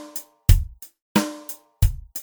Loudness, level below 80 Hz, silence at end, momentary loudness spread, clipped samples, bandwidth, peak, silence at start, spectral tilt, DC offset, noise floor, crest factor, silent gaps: -24 LUFS; -26 dBFS; 0 s; 16 LU; under 0.1%; over 20 kHz; 0 dBFS; 0 s; -5.5 dB/octave; under 0.1%; -40 dBFS; 22 dB; 1.02-1.15 s